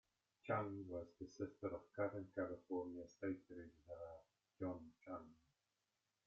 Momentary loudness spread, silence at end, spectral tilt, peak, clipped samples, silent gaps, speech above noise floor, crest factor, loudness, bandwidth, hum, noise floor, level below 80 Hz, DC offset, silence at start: 13 LU; 0.95 s; -7.5 dB/octave; -30 dBFS; under 0.1%; none; 41 dB; 20 dB; -50 LUFS; 7.4 kHz; none; -90 dBFS; -80 dBFS; under 0.1%; 0.45 s